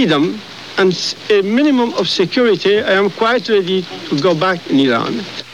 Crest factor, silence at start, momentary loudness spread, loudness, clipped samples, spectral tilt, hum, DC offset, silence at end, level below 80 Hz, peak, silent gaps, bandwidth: 12 dB; 0 s; 7 LU; -15 LUFS; under 0.1%; -5 dB/octave; none; 0.3%; 0 s; -62 dBFS; -2 dBFS; none; 11.5 kHz